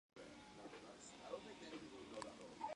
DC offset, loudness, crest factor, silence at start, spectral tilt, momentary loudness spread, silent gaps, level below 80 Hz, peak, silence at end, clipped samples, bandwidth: under 0.1%; -55 LUFS; 24 dB; 0.15 s; -3.5 dB/octave; 6 LU; none; -78 dBFS; -30 dBFS; 0 s; under 0.1%; 11 kHz